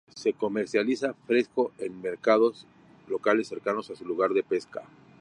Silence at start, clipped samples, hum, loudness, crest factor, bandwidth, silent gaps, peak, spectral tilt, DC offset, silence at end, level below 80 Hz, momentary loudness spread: 0.15 s; under 0.1%; none; -28 LUFS; 20 dB; 10.5 kHz; none; -8 dBFS; -5 dB/octave; under 0.1%; 0.35 s; -74 dBFS; 10 LU